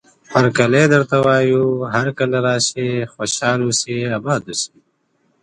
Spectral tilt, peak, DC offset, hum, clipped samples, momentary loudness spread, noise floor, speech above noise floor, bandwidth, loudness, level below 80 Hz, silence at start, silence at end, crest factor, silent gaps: -4.5 dB/octave; 0 dBFS; under 0.1%; none; under 0.1%; 8 LU; -64 dBFS; 47 dB; 11 kHz; -17 LUFS; -56 dBFS; 0.3 s; 0.75 s; 16 dB; none